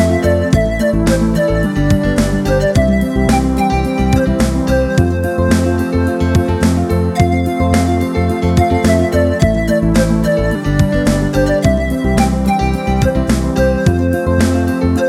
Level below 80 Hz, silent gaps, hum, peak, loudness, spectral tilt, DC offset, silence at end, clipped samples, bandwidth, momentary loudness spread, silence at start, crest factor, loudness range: -22 dBFS; none; none; 0 dBFS; -14 LUFS; -6.5 dB/octave; under 0.1%; 0 s; under 0.1%; 15 kHz; 2 LU; 0 s; 12 dB; 1 LU